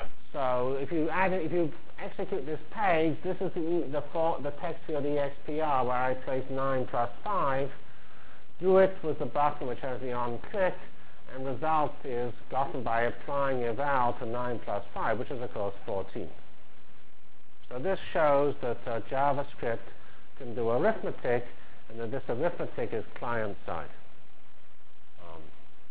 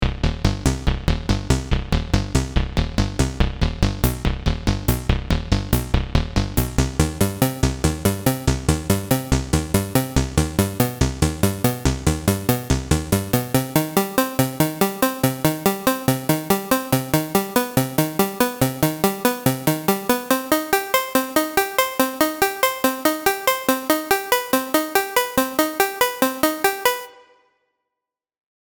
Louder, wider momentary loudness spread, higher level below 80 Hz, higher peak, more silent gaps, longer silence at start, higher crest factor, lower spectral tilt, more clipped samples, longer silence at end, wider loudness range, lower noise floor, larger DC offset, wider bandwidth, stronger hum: second, -31 LUFS vs -21 LUFS; first, 12 LU vs 3 LU; second, -58 dBFS vs -30 dBFS; second, -12 dBFS vs -4 dBFS; neither; about the same, 0 s vs 0 s; about the same, 20 dB vs 18 dB; first, -10 dB/octave vs -5 dB/octave; neither; second, 0.4 s vs 1.65 s; first, 6 LU vs 3 LU; second, -62 dBFS vs -85 dBFS; first, 4% vs under 0.1%; second, 4 kHz vs over 20 kHz; neither